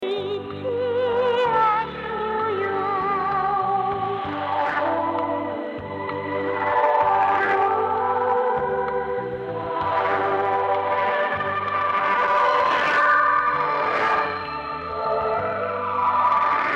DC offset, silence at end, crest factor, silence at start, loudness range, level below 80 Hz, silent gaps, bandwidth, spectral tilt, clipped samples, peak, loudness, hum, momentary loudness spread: under 0.1%; 0 s; 12 dB; 0 s; 4 LU; -56 dBFS; none; 8.6 kHz; -6 dB/octave; under 0.1%; -10 dBFS; -22 LUFS; none; 9 LU